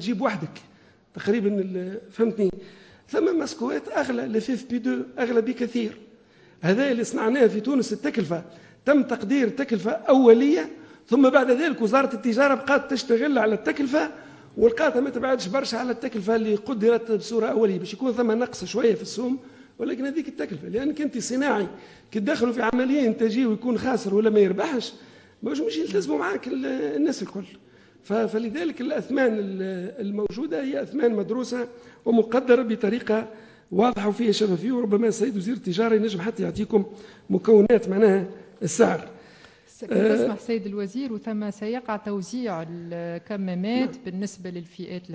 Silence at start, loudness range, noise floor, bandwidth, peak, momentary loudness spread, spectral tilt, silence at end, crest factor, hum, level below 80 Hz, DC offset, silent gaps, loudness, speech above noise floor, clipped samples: 0 s; 6 LU; -54 dBFS; 8 kHz; -2 dBFS; 12 LU; -6 dB/octave; 0 s; 20 dB; none; -62 dBFS; under 0.1%; none; -24 LUFS; 31 dB; under 0.1%